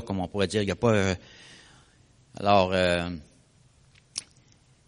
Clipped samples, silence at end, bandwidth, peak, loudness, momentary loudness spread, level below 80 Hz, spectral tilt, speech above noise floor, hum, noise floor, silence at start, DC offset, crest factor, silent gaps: under 0.1%; 0.65 s; 10.5 kHz; -6 dBFS; -26 LUFS; 17 LU; -56 dBFS; -5 dB/octave; 34 dB; none; -60 dBFS; 0 s; under 0.1%; 22 dB; none